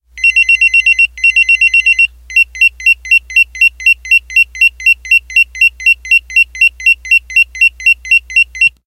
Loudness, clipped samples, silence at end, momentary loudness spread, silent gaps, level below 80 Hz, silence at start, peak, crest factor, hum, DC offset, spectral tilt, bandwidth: -7 LUFS; under 0.1%; 0.15 s; 4 LU; none; -38 dBFS; 0.15 s; 0 dBFS; 10 dB; none; under 0.1%; 3 dB/octave; 14.5 kHz